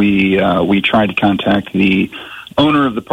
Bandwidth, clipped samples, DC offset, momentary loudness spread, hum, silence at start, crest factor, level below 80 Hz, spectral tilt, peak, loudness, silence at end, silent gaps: 9.2 kHz; under 0.1%; under 0.1%; 6 LU; none; 0 s; 12 dB; -44 dBFS; -7.5 dB/octave; -2 dBFS; -13 LUFS; 0 s; none